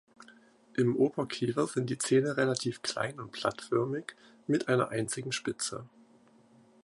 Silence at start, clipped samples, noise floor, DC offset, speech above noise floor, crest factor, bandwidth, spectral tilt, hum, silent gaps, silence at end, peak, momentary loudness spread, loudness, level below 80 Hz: 0.2 s; under 0.1%; -61 dBFS; under 0.1%; 31 dB; 20 dB; 11.5 kHz; -5 dB/octave; none; none; 0.95 s; -12 dBFS; 9 LU; -31 LUFS; -72 dBFS